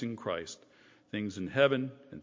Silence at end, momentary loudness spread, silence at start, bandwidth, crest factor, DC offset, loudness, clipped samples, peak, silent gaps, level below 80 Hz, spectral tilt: 0 s; 16 LU; 0 s; 7.6 kHz; 22 dB; under 0.1%; -32 LUFS; under 0.1%; -10 dBFS; none; -66 dBFS; -5.5 dB/octave